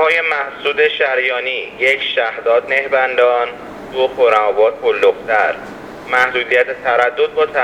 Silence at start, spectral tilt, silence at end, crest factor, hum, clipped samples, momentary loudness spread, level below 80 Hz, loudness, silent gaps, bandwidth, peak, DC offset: 0 s; -3 dB/octave; 0 s; 16 dB; none; under 0.1%; 6 LU; -54 dBFS; -15 LUFS; none; 10.5 kHz; 0 dBFS; under 0.1%